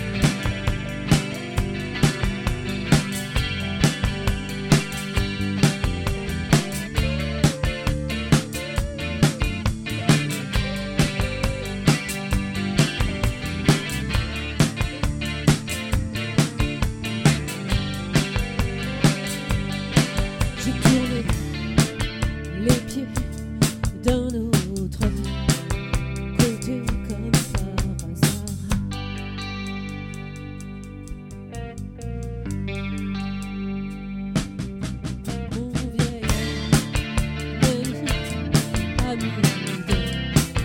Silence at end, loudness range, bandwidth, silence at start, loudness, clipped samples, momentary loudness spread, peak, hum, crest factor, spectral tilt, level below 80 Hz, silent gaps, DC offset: 0 s; 6 LU; 17.5 kHz; 0 s; -24 LUFS; under 0.1%; 9 LU; -4 dBFS; none; 20 dB; -5 dB/octave; -32 dBFS; none; under 0.1%